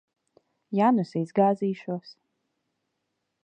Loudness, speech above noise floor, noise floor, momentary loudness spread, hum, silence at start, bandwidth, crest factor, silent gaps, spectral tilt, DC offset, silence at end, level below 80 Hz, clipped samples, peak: -26 LUFS; 55 dB; -80 dBFS; 12 LU; none; 0.7 s; 8.6 kHz; 20 dB; none; -8.5 dB/octave; under 0.1%; 1.3 s; -80 dBFS; under 0.1%; -8 dBFS